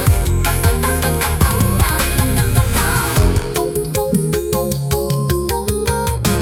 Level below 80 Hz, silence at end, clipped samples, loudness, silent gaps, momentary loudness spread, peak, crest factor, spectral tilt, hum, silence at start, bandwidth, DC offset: -22 dBFS; 0 s; under 0.1%; -16 LUFS; none; 4 LU; 0 dBFS; 14 dB; -5 dB/octave; none; 0 s; 18 kHz; under 0.1%